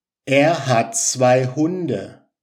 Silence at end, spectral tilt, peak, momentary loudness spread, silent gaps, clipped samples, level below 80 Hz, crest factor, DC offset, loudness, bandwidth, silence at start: 0.3 s; -4.5 dB/octave; -2 dBFS; 10 LU; none; under 0.1%; -72 dBFS; 16 dB; under 0.1%; -18 LUFS; 15.5 kHz; 0.25 s